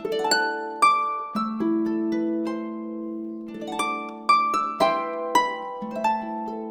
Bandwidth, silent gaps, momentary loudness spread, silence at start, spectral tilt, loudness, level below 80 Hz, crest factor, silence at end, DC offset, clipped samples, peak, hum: 18 kHz; none; 13 LU; 0 s; -3.5 dB/octave; -25 LUFS; -64 dBFS; 18 dB; 0 s; under 0.1%; under 0.1%; -6 dBFS; none